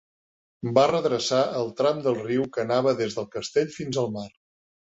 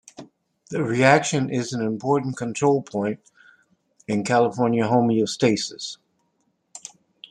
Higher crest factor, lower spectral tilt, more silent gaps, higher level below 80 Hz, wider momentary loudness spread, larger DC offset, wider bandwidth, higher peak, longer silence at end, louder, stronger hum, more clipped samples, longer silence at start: about the same, 20 dB vs 22 dB; about the same, -5 dB/octave vs -5 dB/octave; neither; about the same, -64 dBFS vs -66 dBFS; second, 9 LU vs 20 LU; neither; second, 8 kHz vs 11.5 kHz; second, -6 dBFS vs -2 dBFS; about the same, 0.6 s vs 0.5 s; second, -25 LUFS vs -22 LUFS; neither; neither; first, 0.65 s vs 0.2 s